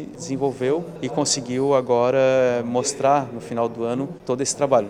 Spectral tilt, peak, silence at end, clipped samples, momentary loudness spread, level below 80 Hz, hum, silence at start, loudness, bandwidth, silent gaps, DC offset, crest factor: -4.5 dB/octave; -4 dBFS; 0 s; under 0.1%; 9 LU; -58 dBFS; none; 0 s; -22 LUFS; 12.5 kHz; none; under 0.1%; 16 dB